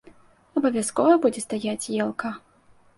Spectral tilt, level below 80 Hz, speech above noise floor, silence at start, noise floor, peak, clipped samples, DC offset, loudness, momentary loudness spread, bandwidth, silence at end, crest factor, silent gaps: -4.5 dB/octave; -66 dBFS; 34 dB; 0.55 s; -57 dBFS; -6 dBFS; under 0.1%; under 0.1%; -24 LUFS; 13 LU; 11.5 kHz; 0.6 s; 18 dB; none